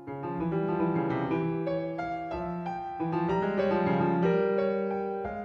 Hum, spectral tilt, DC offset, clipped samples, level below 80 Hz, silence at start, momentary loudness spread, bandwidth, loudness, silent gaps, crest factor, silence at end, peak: none; -9.5 dB/octave; under 0.1%; under 0.1%; -56 dBFS; 0 s; 8 LU; 6.2 kHz; -29 LUFS; none; 14 dB; 0 s; -14 dBFS